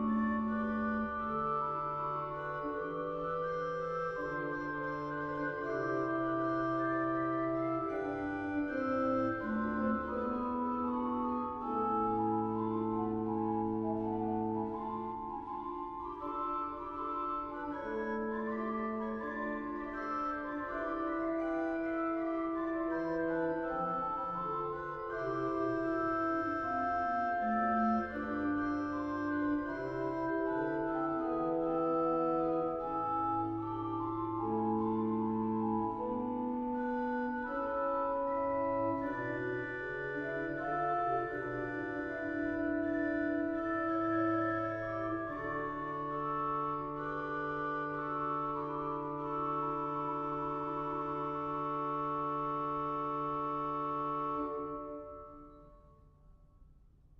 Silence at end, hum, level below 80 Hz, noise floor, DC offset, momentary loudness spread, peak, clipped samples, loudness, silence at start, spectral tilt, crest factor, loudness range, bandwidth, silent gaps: 0.5 s; none; -60 dBFS; -61 dBFS; under 0.1%; 5 LU; -22 dBFS; under 0.1%; -36 LUFS; 0 s; -8.5 dB/octave; 14 dB; 4 LU; 6.2 kHz; none